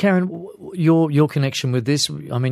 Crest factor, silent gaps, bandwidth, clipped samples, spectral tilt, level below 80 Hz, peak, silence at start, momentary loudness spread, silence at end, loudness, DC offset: 16 dB; none; 14.5 kHz; under 0.1%; -6 dB/octave; -64 dBFS; -4 dBFS; 0 s; 11 LU; 0 s; -19 LUFS; under 0.1%